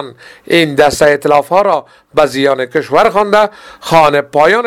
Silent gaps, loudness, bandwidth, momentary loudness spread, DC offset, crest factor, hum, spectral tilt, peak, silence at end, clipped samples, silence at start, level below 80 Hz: none; -11 LUFS; 16 kHz; 8 LU; 0.4%; 10 dB; none; -4.5 dB/octave; 0 dBFS; 0 s; 0.6%; 0 s; -44 dBFS